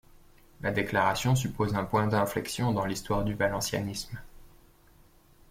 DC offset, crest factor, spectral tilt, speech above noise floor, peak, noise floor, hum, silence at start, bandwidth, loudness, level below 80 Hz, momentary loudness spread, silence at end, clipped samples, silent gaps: under 0.1%; 18 dB; -5 dB/octave; 30 dB; -12 dBFS; -59 dBFS; none; 0.6 s; 16.5 kHz; -29 LUFS; -50 dBFS; 9 LU; 1.05 s; under 0.1%; none